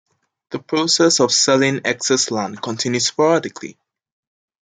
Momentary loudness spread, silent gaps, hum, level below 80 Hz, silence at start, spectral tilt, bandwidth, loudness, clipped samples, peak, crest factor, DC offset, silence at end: 18 LU; none; none; -66 dBFS; 0.5 s; -3 dB/octave; 10.5 kHz; -17 LUFS; under 0.1%; -2 dBFS; 16 dB; under 0.1%; 1.1 s